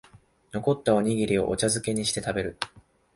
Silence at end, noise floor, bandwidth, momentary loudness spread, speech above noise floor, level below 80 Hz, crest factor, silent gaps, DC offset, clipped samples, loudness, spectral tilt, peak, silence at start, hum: 0.35 s; -54 dBFS; 11.5 kHz; 11 LU; 29 dB; -52 dBFS; 20 dB; none; under 0.1%; under 0.1%; -26 LUFS; -4.5 dB/octave; -6 dBFS; 0.55 s; none